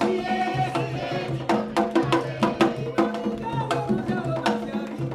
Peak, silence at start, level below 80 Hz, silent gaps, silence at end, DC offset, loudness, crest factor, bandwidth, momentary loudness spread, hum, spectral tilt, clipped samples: -4 dBFS; 0 s; -54 dBFS; none; 0 s; under 0.1%; -25 LUFS; 20 dB; 14 kHz; 6 LU; none; -6.5 dB/octave; under 0.1%